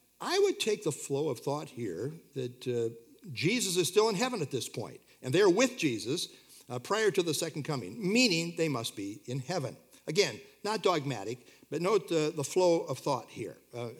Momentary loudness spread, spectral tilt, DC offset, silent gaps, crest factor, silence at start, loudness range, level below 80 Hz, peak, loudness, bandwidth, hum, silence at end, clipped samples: 15 LU; -4 dB/octave; under 0.1%; none; 20 dB; 0.2 s; 4 LU; -80 dBFS; -12 dBFS; -31 LUFS; 18 kHz; none; 0 s; under 0.1%